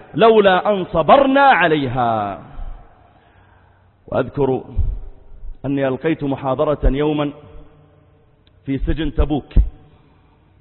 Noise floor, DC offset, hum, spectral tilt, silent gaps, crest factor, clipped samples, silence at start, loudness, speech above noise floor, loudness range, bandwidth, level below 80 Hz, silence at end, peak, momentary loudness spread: -52 dBFS; under 0.1%; none; -11.5 dB/octave; none; 18 dB; under 0.1%; 0.15 s; -17 LUFS; 37 dB; 9 LU; 4.3 kHz; -28 dBFS; 0.85 s; 0 dBFS; 15 LU